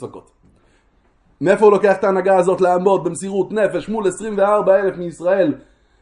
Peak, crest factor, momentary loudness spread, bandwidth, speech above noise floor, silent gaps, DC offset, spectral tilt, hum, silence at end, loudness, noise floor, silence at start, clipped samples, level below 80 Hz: 0 dBFS; 16 dB; 10 LU; 11 kHz; 41 dB; none; under 0.1%; -6 dB/octave; none; 0.4 s; -16 LUFS; -57 dBFS; 0 s; under 0.1%; -56 dBFS